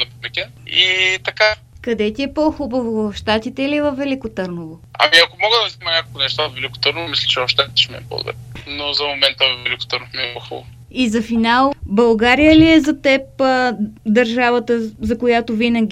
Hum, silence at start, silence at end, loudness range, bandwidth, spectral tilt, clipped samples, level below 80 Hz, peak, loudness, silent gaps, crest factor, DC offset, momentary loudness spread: none; 0 s; 0 s; 5 LU; 14 kHz; -4.5 dB/octave; under 0.1%; -42 dBFS; 0 dBFS; -16 LUFS; none; 16 dB; under 0.1%; 13 LU